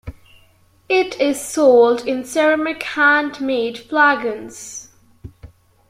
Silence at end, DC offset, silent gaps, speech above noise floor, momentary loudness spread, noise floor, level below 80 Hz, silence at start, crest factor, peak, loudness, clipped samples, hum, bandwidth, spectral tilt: 0.45 s; under 0.1%; none; 37 dB; 18 LU; -54 dBFS; -50 dBFS; 0.05 s; 16 dB; -2 dBFS; -16 LUFS; under 0.1%; none; 16 kHz; -3.5 dB/octave